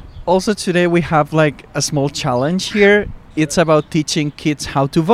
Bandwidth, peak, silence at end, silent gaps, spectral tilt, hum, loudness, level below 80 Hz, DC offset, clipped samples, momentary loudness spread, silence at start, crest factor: 15 kHz; 0 dBFS; 0 s; none; -5 dB/octave; none; -16 LUFS; -40 dBFS; under 0.1%; under 0.1%; 7 LU; 0 s; 16 dB